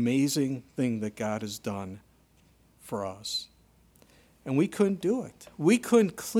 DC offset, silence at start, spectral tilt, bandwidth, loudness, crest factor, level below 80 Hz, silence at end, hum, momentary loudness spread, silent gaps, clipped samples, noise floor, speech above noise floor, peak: under 0.1%; 0 s; -5.5 dB/octave; 17 kHz; -29 LUFS; 18 dB; -66 dBFS; 0 s; none; 15 LU; none; under 0.1%; -62 dBFS; 34 dB; -10 dBFS